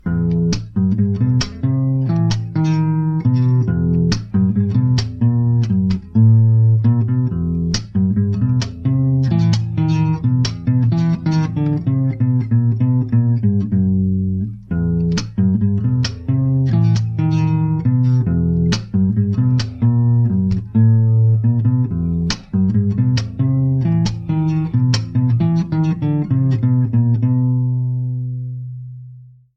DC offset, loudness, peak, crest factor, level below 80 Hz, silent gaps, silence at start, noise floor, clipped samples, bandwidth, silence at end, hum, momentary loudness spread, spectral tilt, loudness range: under 0.1%; -17 LUFS; -2 dBFS; 14 dB; -38 dBFS; none; 0.05 s; -40 dBFS; under 0.1%; 7.2 kHz; 0.3 s; none; 5 LU; -8 dB/octave; 2 LU